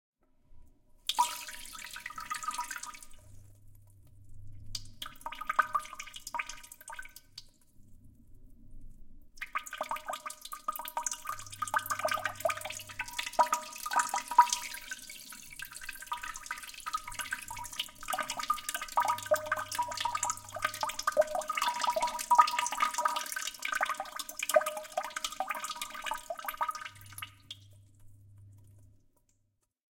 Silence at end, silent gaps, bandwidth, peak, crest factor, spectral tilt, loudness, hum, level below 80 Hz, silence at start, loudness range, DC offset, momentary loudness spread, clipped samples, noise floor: 1.1 s; none; 17 kHz; -8 dBFS; 28 dB; -0.5 dB/octave; -34 LUFS; none; -58 dBFS; 0.5 s; 13 LU; under 0.1%; 15 LU; under 0.1%; -77 dBFS